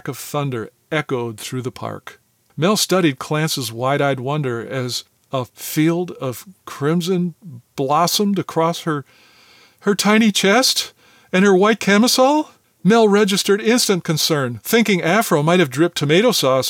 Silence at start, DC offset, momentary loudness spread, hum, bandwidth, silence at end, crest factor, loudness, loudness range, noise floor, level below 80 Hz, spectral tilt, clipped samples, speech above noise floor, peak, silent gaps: 0.05 s; under 0.1%; 13 LU; none; 17.5 kHz; 0 s; 14 dB; -17 LUFS; 7 LU; -50 dBFS; -66 dBFS; -4.5 dB/octave; under 0.1%; 33 dB; -4 dBFS; none